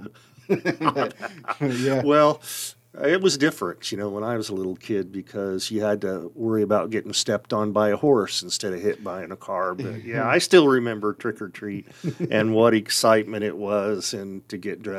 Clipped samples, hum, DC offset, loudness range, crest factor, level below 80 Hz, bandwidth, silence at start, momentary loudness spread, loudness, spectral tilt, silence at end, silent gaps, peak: under 0.1%; none; under 0.1%; 4 LU; 20 dB; -70 dBFS; 15.5 kHz; 0 s; 13 LU; -23 LUFS; -4.5 dB/octave; 0 s; none; -2 dBFS